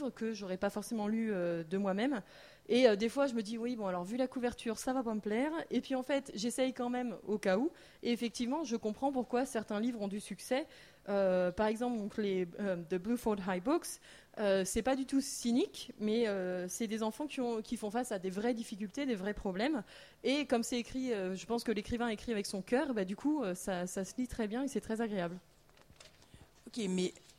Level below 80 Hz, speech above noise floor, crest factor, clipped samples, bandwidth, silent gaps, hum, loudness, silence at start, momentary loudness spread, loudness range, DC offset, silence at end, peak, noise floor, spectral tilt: -62 dBFS; 27 dB; 22 dB; under 0.1%; 16 kHz; none; none; -36 LUFS; 0 s; 7 LU; 3 LU; under 0.1%; 0.2 s; -14 dBFS; -62 dBFS; -5 dB/octave